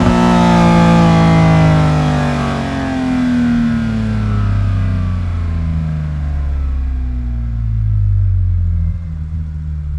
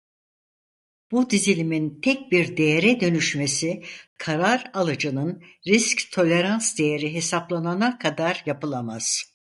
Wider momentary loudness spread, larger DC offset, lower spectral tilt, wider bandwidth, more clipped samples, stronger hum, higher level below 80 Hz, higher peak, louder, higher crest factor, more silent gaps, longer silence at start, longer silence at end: about the same, 11 LU vs 9 LU; neither; first, -7.5 dB/octave vs -4 dB/octave; about the same, 11 kHz vs 11.5 kHz; neither; neither; first, -22 dBFS vs -66 dBFS; first, 0 dBFS vs -4 dBFS; first, -15 LUFS vs -22 LUFS; second, 12 dB vs 20 dB; second, none vs 4.07-4.16 s; second, 0 s vs 1.1 s; second, 0 s vs 0.35 s